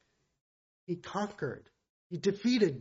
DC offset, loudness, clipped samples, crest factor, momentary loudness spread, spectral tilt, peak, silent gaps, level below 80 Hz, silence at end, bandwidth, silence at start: under 0.1%; -34 LUFS; under 0.1%; 20 dB; 14 LU; -5 dB/octave; -14 dBFS; 1.90-2.10 s; -74 dBFS; 0 s; 7.6 kHz; 0.9 s